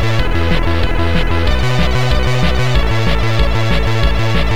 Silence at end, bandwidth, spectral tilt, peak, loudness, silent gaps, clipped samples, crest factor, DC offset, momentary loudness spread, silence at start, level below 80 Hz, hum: 0 s; 14.5 kHz; -6 dB/octave; 0 dBFS; -15 LUFS; none; under 0.1%; 12 dB; 20%; 1 LU; 0 s; -18 dBFS; none